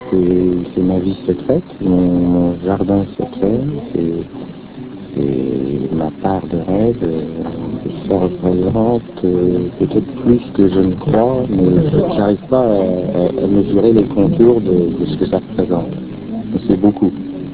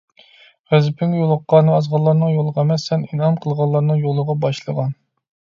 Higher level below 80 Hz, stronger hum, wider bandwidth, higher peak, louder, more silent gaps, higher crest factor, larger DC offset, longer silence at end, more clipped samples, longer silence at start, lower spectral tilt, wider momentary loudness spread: first, -38 dBFS vs -62 dBFS; neither; second, 4 kHz vs 7.2 kHz; about the same, 0 dBFS vs 0 dBFS; about the same, -15 LUFS vs -17 LUFS; neither; about the same, 14 dB vs 16 dB; first, 0.2% vs under 0.1%; second, 0 s vs 0.65 s; neither; second, 0 s vs 0.7 s; first, -13 dB/octave vs -8 dB/octave; first, 11 LU vs 8 LU